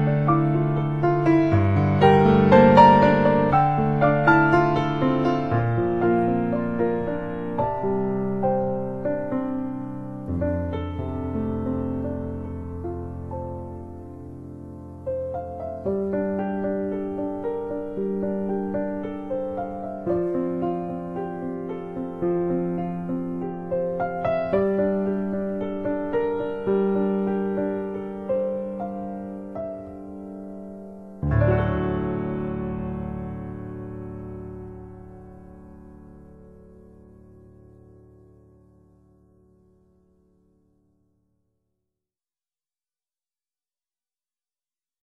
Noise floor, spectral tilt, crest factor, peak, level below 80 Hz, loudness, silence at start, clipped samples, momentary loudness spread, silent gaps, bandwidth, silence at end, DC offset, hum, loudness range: under -90 dBFS; -9.5 dB/octave; 22 dB; -2 dBFS; -46 dBFS; -23 LUFS; 0 s; under 0.1%; 18 LU; none; 7.2 kHz; 8.3 s; under 0.1%; none; 16 LU